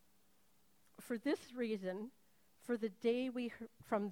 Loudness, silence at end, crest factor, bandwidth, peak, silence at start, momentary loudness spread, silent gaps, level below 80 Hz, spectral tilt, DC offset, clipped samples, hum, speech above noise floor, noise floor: -41 LUFS; 0 s; 20 dB; 19 kHz; -24 dBFS; 1 s; 16 LU; none; -82 dBFS; -6 dB/octave; under 0.1%; under 0.1%; none; 35 dB; -75 dBFS